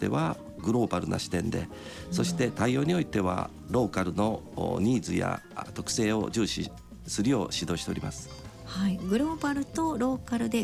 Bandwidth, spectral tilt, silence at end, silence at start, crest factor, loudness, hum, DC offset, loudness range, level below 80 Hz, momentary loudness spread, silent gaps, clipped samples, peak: 15 kHz; -5.5 dB/octave; 0 s; 0 s; 14 dB; -30 LUFS; none; under 0.1%; 2 LU; -50 dBFS; 9 LU; none; under 0.1%; -14 dBFS